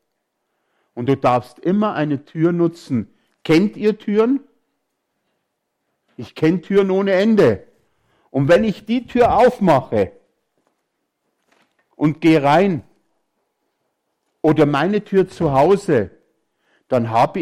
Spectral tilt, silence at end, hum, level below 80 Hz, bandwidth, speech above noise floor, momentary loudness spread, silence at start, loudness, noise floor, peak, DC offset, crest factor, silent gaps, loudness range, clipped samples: -7.5 dB/octave; 0 s; none; -50 dBFS; 13.5 kHz; 58 dB; 11 LU; 0.95 s; -17 LUFS; -74 dBFS; -6 dBFS; under 0.1%; 14 dB; none; 4 LU; under 0.1%